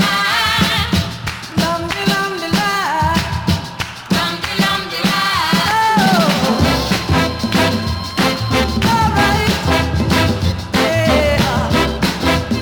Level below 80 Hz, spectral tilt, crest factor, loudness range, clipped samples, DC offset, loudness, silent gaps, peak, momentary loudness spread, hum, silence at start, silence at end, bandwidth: -32 dBFS; -4.5 dB/octave; 14 dB; 3 LU; under 0.1%; under 0.1%; -15 LUFS; none; -2 dBFS; 5 LU; none; 0 s; 0 s; over 20 kHz